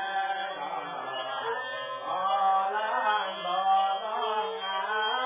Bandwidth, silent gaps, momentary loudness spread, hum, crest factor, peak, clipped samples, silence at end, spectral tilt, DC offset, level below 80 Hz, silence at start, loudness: 3.8 kHz; none; 9 LU; none; 14 dB; -14 dBFS; under 0.1%; 0 s; 2 dB/octave; under 0.1%; under -90 dBFS; 0 s; -29 LUFS